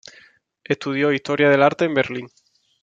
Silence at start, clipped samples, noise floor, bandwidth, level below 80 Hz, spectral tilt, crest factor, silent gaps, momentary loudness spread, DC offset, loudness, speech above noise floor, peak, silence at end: 0.7 s; under 0.1%; -53 dBFS; 7.8 kHz; -66 dBFS; -6 dB/octave; 18 dB; none; 11 LU; under 0.1%; -19 LUFS; 34 dB; -2 dBFS; 0.55 s